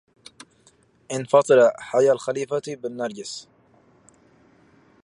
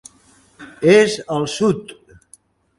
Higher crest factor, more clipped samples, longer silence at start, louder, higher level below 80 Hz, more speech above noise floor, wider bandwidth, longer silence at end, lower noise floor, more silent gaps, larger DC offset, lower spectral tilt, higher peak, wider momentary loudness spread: about the same, 20 dB vs 18 dB; neither; first, 1.1 s vs 0.6 s; second, -21 LUFS vs -17 LUFS; second, -72 dBFS vs -58 dBFS; about the same, 38 dB vs 37 dB; about the same, 11 kHz vs 11.5 kHz; first, 1.65 s vs 0.85 s; first, -59 dBFS vs -53 dBFS; neither; neither; about the same, -4.5 dB/octave vs -5 dB/octave; second, -4 dBFS vs 0 dBFS; first, 17 LU vs 10 LU